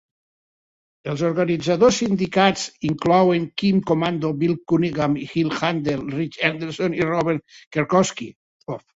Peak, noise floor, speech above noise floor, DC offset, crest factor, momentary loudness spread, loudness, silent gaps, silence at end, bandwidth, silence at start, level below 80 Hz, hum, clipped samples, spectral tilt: -2 dBFS; under -90 dBFS; over 69 dB; under 0.1%; 18 dB; 11 LU; -21 LUFS; 7.67-7.71 s, 8.36-8.60 s; 0.2 s; 8 kHz; 1.05 s; -54 dBFS; none; under 0.1%; -5.5 dB/octave